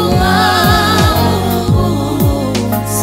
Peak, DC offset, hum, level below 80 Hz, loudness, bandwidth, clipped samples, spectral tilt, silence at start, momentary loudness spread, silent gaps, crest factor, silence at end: 0 dBFS; under 0.1%; none; -24 dBFS; -12 LUFS; 16.5 kHz; under 0.1%; -5 dB/octave; 0 s; 5 LU; none; 12 dB; 0 s